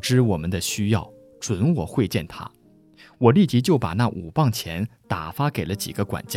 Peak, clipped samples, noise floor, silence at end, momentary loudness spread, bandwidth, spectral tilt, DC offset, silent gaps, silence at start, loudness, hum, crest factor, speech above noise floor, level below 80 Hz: -4 dBFS; under 0.1%; -52 dBFS; 0 s; 12 LU; 17 kHz; -6 dB/octave; under 0.1%; none; 0.05 s; -23 LUFS; none; 20 dB; 30 dB; -48 dBFS